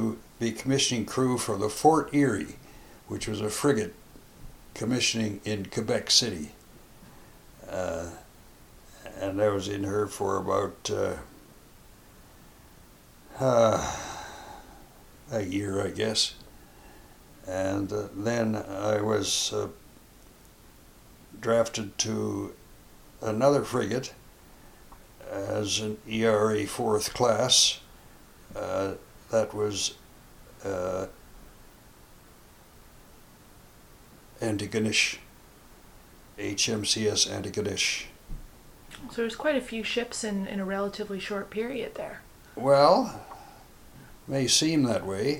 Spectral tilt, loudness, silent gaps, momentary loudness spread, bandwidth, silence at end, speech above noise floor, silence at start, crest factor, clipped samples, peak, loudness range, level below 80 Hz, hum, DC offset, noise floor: -3.5 dB/octave; -27 LUFS; none; 18 LU; 17 kHz; 0 s; 26 dB; 0 s; 24 dB; under 0.1%; -6 dBFS; 7 LU; -54 dBFS; none; under 0.1%; -53 dBFS